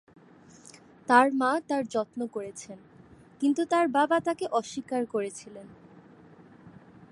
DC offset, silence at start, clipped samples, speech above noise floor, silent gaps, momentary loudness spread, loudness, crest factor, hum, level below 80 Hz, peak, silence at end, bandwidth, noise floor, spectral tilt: under 0.1%; 1.1 s; under 0.1%; 27 dB; none; 21 LU; -27 LUFS; 24 dB; none; -72 dBFS; -6 dBFS; 0.4 s; 11.5 kHz; -54 dBFS; -4.5 dB/octave